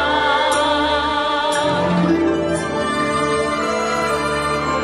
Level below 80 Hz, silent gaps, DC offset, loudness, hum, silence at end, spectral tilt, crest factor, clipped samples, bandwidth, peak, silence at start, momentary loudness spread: -40 dBFS; none; under 0.1%; -18 LUFS; none; 0 s; -4.5 dB/octave; 12 dB; under 0.1%; 13 kHz; -6 dBFS; 0 s; 3 LU